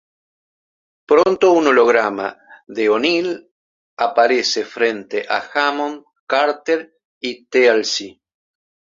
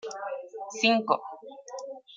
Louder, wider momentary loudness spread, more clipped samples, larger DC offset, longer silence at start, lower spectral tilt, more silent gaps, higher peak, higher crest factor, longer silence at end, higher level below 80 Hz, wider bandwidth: first, -17 LUFS vs -28 LUFS; second, 15 LU vs 19 LU; neither; neither; first, 1.1 s vs 0.05 s; about the same, -3 dB/octave vs -3 dB/octave; first, 3.51-3.97 s, 6.20-6.27 s, 7.05-7.21 s vs none; first, 0 dBFS vs -8 dBFS; about the same, 18 dB vs 22 dB; first, 0.9 s vs 0 s; first, -66 dBFS vs -86 dBFS; about the same, 7.6 kHz vs 7.6 kHz